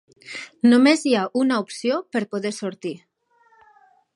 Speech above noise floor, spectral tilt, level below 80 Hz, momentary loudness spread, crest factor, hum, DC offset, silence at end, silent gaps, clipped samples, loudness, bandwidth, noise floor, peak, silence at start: 40 dB; -4.5 dB/octave; -76 dBFS; 20 LU; 18 dB; none; under 0.1%; 1.2 s; none; under 0.1%; -20 LUFS; 11.5 kHz; -60 dBFS; -4 dBFS; 0.25 s